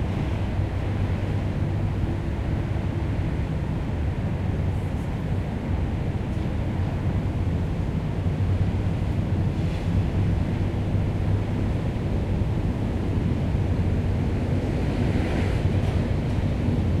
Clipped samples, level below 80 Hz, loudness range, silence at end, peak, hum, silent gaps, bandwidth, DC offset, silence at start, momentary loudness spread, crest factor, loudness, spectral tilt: under 0.1%; -32 dBFS; 3 LU; 0 s; -12 dBFS; none; none; 9.8 kHz; under 0.1%; 0 s; 3 LU; 12 dB; -26 LUFS; -8.5 dB/octave